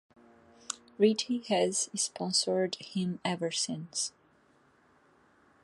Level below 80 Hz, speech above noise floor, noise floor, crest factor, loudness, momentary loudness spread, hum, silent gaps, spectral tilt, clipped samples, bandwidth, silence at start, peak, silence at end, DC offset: -76 dBFS; 35 dB; -66 dBFS; 20 dB; -31 LUFS; 8 LU; none; none; -3.5 dB/octave; under 0.1%; 11.5 kHz; 0.7 s; -12 dBFS; 1.55 s; under 0.1%